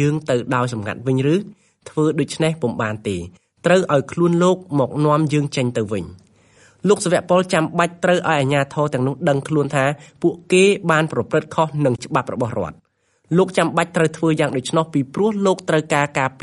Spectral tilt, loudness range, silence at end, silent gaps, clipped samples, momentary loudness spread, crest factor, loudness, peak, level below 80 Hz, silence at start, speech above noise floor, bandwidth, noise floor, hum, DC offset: -6 dB/octave; 2 LU; 0.1 s; none; under 0.1%; 7 LU; 18 dB; -19 LUFS; -2 dBFS; -56 dBFS; 0 s; 44 dB; 11.5 kHz; -63 dBFS; none; under 0.1%